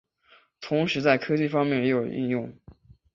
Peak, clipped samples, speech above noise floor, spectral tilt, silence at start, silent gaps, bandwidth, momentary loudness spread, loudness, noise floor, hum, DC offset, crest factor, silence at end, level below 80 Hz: -8 dBFS; under 0.1%; 35 dB; -7 dB/octave; 0.6 s; none; 7.4 kHz; 9 LU; -25 LUFS; -60 dBFS; none; under 0.1%; 20 dB; 0.4 s; -62 dBFS